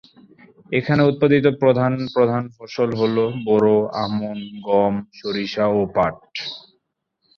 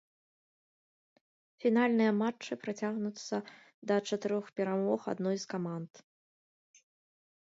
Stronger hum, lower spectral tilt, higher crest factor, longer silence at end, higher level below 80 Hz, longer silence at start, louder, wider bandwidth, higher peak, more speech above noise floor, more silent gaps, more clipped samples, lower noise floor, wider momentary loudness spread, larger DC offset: neither; first, -8 dB/octave vs -6 dB/octave; about the same, 18 dB vs 20 dB; second, 0.8 s vs 1.55 s; first, -54 dBFS vs -86 dBFS; second, 0.7 s vs 1.6 s; first, -20 LUFS vs -33 LUFS; second, 6.6 kHz vs 7.8 kHz; first, -2 dBFS vs -16 dBFS; second, 53 dB vs over 57 dB; second, none vs 3.74-3.82 s; neither; second, -72 dBFS vs under -90 dBFS; about the same, 13 LU vs 12 LU; neither